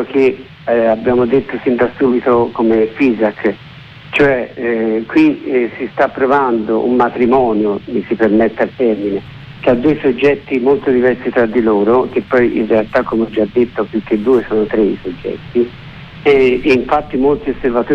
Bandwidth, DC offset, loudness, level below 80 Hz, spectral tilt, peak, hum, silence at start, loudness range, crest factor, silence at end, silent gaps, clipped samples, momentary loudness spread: 6.4 kHz; under 0.1%; -14 LUFS; -42 dBFS; -8 dB/octave; -2 dBFS; none; 0 s; 2 LU; 12 dB; 0 s; none; under 0.1%; 7 LU